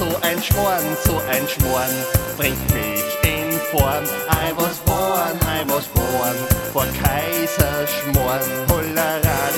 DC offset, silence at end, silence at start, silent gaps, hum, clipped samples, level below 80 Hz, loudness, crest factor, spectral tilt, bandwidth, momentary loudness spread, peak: under 0.1%; 0 s; 0 s; none; none; under 0.1%; -30 dBFS; -19 LUFS; 18 dB; -4.5 dB/octave; 17.5 kHz; 2 LU; -2 dBFS